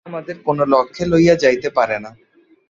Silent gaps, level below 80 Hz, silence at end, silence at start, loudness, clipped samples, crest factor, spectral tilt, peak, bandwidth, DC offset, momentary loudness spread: none; -48 dBFS; 0.6 s; 0.05 s; -16 LUFS; under 0.1%; 16 dB; -6 dB/octave; -2 dBFS; 7.6 kHz; under 0.1%; 11 LU